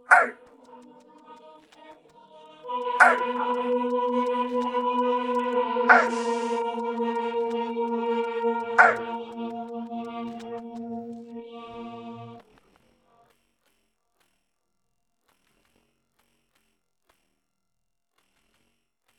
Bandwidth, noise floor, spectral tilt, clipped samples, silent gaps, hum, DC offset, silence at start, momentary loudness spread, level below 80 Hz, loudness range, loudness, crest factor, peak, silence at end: 11.5 kHz; -82 dBFS; -4 dB/octave; under 0.1%; none; none; under 0.1%; 0.1 s; 21 LU; -76 dBFS; 18 LU; -25 LUFS; 26 dB; -2 dBFS; 6.75 s